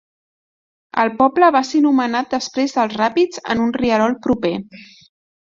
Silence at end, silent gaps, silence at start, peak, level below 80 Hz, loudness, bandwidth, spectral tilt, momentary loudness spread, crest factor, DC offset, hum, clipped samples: 0.6 s; none; 0.95 s; -2 dBFS; -52 dBFS; -17 LUFS; 7.6 kHz; -5 dB/octave; 7 LU; 16 dB; under 0.1%; none; under 0.1%